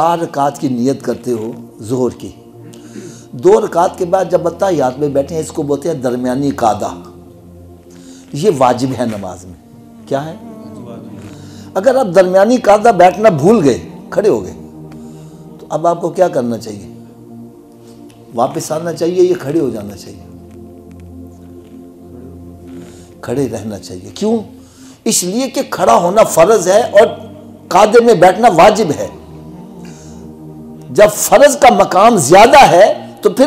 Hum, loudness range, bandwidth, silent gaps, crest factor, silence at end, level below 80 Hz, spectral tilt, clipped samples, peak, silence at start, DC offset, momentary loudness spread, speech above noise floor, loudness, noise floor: none; 11 LU; 16 kHz; none; 12 dB; 0 s; -46 dBFS; -4.5 dB/octave; under 0.1%; 0 dBFS; 0 s; under 0.1%; 25 LU; 27 dB; -11 LUFS; -38 dBFS